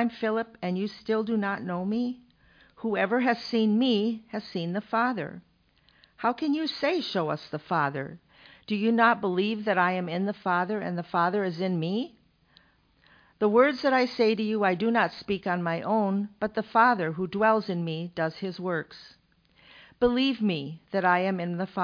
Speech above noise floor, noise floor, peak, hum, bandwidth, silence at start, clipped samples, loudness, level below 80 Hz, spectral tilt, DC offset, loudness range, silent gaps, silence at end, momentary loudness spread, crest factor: 38 dB; -64 dBFS; -8 dBFS; none; 5.2 kHz; 0 s; under 0.1%; -27 LUFS; -64 dBFS; -7.5 dB/octave; under 0.1%; 4 LU; none; 0 s; 10 LU; 20 dB